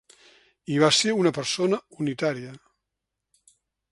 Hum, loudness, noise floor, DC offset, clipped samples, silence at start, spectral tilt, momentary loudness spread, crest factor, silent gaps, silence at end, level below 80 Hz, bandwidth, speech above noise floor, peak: none; -23 LUFS; -84 dBFS; under 0.1%; under 0.1%; 0.7 s; -4 dB/octave; 17 LU; 22 dB; none; 1.35 s; -70 dBFS; 11.5 kHz; 60 dB; -4 dBFS